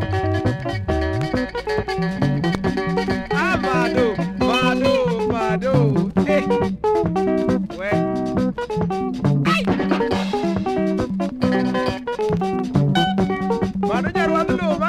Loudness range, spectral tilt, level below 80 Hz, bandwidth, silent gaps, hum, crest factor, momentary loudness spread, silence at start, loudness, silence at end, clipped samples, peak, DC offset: 2 LU; -7 dB/octave; -40 dBFS; 12 kHz; none; none; 16 dB; 5 LU; 0 s; -20 LUFS; 0 s; under 0.1%; -4 dBFS; under 0.1%